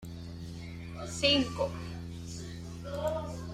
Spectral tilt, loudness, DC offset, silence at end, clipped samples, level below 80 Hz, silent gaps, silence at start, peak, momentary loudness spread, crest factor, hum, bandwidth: -4.5 dB/octave; -34 LUFS; under 0.1%; 0 s; under 0.1%; -52 dBFS; none; 0 s; -12 dBFS; 17 LU; 22 dB; none; 14.5 kHz